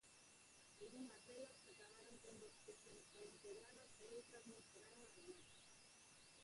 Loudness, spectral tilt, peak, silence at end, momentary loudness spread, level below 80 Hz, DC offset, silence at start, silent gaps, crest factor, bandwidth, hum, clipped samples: -61 LUFS; -2.5 dB/octave; -44 dBFS; 0 s; 7 LU; -88 dBFS; under 0.1%; 0 s; none; 18 dB; 11.5 kHz; none; under 0.1%